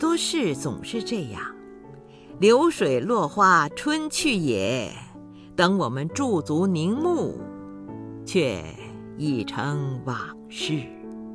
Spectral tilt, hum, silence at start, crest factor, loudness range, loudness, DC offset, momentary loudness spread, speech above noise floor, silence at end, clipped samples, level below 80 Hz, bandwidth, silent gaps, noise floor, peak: -5 dB/octave; none; 0 s; 20 dB; 7 LU; -24 LUFS; under 0.1%; 19 LU; 22 dB; 0 s; under 0.1%; -56 dBFS; 11 kHz; none; -45 dBFS; -6 dBFS